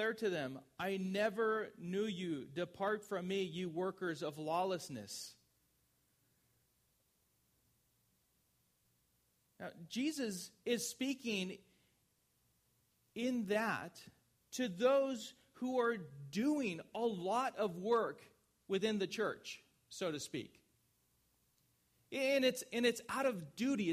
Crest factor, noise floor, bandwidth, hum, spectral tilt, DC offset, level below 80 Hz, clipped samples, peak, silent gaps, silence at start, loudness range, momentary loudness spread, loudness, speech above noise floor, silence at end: 20 dB; -78 dBFS; 15.5 kHz; none; -4.5 dB/octave; under 0.1%; -82 dBFS; under 0.1%; -22 dBFS; none; 0 s; 8 LU; 12 LU; -39 LUFS; 40 dB; 0 s